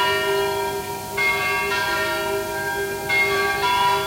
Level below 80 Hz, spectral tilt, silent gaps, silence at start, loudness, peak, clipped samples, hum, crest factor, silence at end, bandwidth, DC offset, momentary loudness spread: -48 dBFS; -2.5 dB/octave; none; 0 s; -21 LUFS; -8 dBFS; under 0.1%; none; 14 dB; 0 s; 16 kHz; under 0.1%; 7 LU